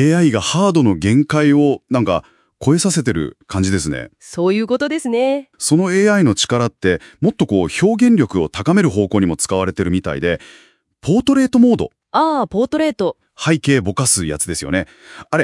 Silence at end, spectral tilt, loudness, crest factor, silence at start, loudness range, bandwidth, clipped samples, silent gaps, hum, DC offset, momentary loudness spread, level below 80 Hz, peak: 0 s; -5 dB/octave; -16 LUFS; 16 dB; 0 s; 3 LU; 12 kHz; under 0.1%; none; none; under 0.1%; 8 LU; -46 dBFS; 0 dBFS